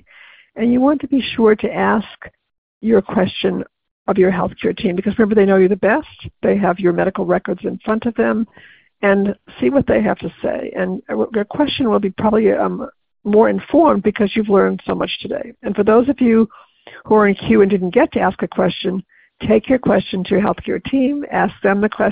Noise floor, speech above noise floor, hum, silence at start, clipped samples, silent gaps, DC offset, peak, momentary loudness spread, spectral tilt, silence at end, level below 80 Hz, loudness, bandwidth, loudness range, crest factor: -46 dBFS; 30 dB; none; 0.55 s; under 0.1%; 2.58-2.81 s, 3.91-4.05 s; under 0.1%; 0 dBFS; 9 LU; -11.5 dB/octave; 0 s; -46 dBFS; -16 LUFS; 5 kHz; 3 LU; 16 dB